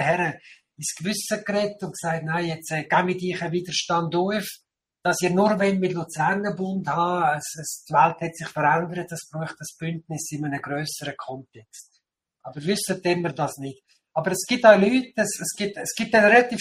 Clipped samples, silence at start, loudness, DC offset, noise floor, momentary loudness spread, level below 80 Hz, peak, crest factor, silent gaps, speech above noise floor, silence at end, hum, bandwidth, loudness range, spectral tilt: under 0.1%; 0 s; -23 LUFS; under 0.1%; -72 dBFS; 14 LU; -64 dBFS; -2 dBFS; 22 dB; none; 48 dB; 0 s; none; 15.5 kHz; 8 LU; -4.5 dB/octave